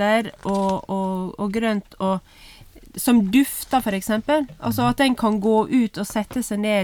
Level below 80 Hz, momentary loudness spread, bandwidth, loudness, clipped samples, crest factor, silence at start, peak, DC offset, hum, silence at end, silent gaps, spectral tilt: -48 dBFS; 7 LU; 19.5 kHz; -22 LUFS; under 0.1%; 16 dB; 0 s; -6 dBFS; under 0.1%; none; 0 s; none; -5 dB/octave